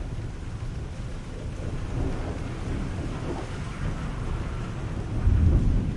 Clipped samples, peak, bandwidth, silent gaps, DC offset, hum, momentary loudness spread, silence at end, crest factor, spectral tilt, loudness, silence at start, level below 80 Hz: under 0.1%; -8 dBFS; 11 kHz; none; under 0.1%; none; 13 LU; 0 s; 18 dB; -7.5 dB/octave; -30 LUFS; 0 s; -30 dBFS